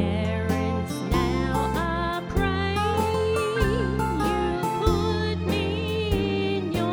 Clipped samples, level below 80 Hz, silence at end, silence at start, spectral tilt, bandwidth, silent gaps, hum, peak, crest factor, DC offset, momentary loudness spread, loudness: under 0.1%; -34 dBFS; 0 s; 0 s; -6 dB/octave; over 20 kHz; none; none; -8 dBFS; 16 dB; under 0.1%; 2 LU; -25 LUFS